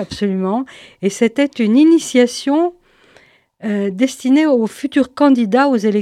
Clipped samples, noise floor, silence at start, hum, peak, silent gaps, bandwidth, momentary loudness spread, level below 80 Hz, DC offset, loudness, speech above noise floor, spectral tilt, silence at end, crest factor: under 0.1%; -50 dBFS; 0 s; none; 0 dBFS; none; 13 kHz; 10 LU; -56 dBFS; under 0.1%; -15 LUFS; 36 dB; -5.5 dB/octave; 0 s; 14 dB